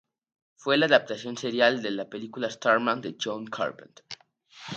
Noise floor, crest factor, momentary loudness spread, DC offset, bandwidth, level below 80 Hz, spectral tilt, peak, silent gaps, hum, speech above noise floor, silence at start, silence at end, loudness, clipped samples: -52 dBFS; 24 dB; 21 LU; under 0.1%; 8.8 kHz; -78 dBFS; -4 dB/octave; -4 dBFS; none; none; 25 dB; 0.6 s; 0 s; -26 LUFS; under 0.1%